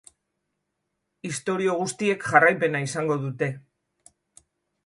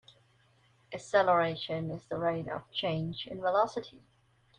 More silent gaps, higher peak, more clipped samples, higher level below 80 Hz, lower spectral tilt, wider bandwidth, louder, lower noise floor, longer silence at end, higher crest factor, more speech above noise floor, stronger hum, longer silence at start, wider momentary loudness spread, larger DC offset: neither; first, -4 dBFS vs -12 dBFS; neither; about the same, -68 dBFS vs -68 dBFS; about the same, -5 dB/octave vs -5.5 dB/octave; first, 11.5 kHz vs 10 kHz; first, -24 LUFS vs -31 LUFS; first, -79 dBFS vs -67 dBFS; first, 1.25 s vs 0.6 s; about the same, 22 dB vs 20 dB; first, 56 dB vs 35 dB; first, 50 Hz at -50 dBFS vs none; first, 1.25 s vs 0.9 s; about the same, 14 LU vs 14 LU; neither